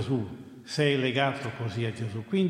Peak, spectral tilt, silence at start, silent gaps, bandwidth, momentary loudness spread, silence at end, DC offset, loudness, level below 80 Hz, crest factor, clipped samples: -10 dBFS; -6 dB/octave; 0 s; none; 11.5 kHz; 10 LU; 0 s; under 0.1%; -29 LUFS; -68 dBFS; 18 dB; under 0.1%